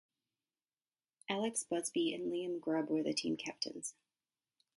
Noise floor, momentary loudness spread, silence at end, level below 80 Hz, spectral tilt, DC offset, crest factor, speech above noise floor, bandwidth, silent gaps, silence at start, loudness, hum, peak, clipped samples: under -90 dBFS; 6 LU; 0.85 s; -84 dBFS; -3.5 dB/octave; under 0.1%; 20 dB; over 52 dB; 11.5 kHz; none; 1.3 s; -38 LUFS; none; -20 dBFS; under 0.1%